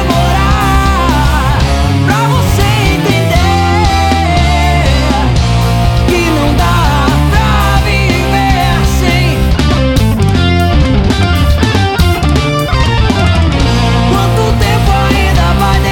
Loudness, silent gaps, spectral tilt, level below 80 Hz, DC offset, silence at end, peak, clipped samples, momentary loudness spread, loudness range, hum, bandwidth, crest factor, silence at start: -10 LUFS; none; -5.5 dB/octave; -14 dBFS; under 0.1%; 0 s; 0 dBFS; under 0.1%; 1 LU; 0 LU; none; 18 kHz; 8 dB; 0 s